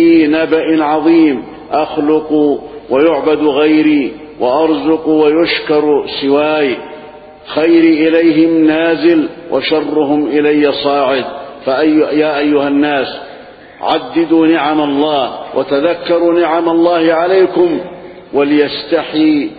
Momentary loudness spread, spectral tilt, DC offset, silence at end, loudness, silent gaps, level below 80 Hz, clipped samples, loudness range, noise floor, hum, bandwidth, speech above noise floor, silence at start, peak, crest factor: 9 LU; -9.5 dB/octave; under 0.1%; 0 s; -12 LUFS; none; -50 dBFS; under 0.1%; 2 LU; -34 dBFS; none; 4.9 kHz; 23 dB; 0 s; 0 dBFS; 12 dB